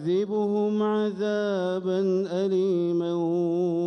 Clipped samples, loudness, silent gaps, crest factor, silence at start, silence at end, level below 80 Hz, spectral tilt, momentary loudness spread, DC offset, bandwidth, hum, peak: under 0.1%; -25 LUFS; none; 10 dB; 0 s; 0 s; -74 dBFS; -8 dB/octave; 2 LU; under 0.1%; 6.8 kHz; none; -16 dBFS